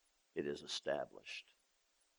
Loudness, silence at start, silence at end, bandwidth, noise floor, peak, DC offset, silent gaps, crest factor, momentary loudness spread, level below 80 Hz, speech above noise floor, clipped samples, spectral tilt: -44 LUFS; 0.35 s; 0.75 s; over 20 kHz; -79 dBFS; -26 dBFS; under 0.1%; none; 22 dB; 9 LU; -80 dBFS; 35 dB; under 0.1%; -3 dB/octave